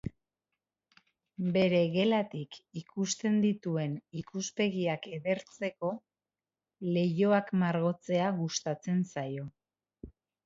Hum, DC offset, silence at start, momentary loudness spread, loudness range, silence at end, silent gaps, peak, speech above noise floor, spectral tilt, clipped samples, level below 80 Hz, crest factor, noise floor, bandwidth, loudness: none; under 0.1%; 0.05 s; 15 LU; 3 LU; 0.35 s; none; -14 dBFS; over 59 dB; -5.5 dB/octave; under 0.1%; -66 dBFS; 18 dB; under -90 dBFS; 7.8 kHz; -31 LUFS